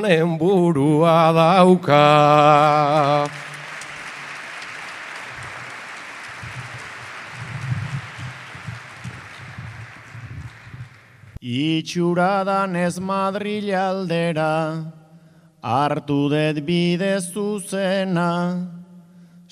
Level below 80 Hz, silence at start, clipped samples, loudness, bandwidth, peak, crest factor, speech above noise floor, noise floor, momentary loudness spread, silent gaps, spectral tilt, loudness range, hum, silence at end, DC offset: -58 dBFS; 0 s; under 0.1%; -18 LUFS; 13.5 kHz; 0 dBFS; 20 dB; 32 dB; -49 dBFS; 22 LU; none; -6 dB/octave; 17 LU; none; 0.5 s; under 0.1%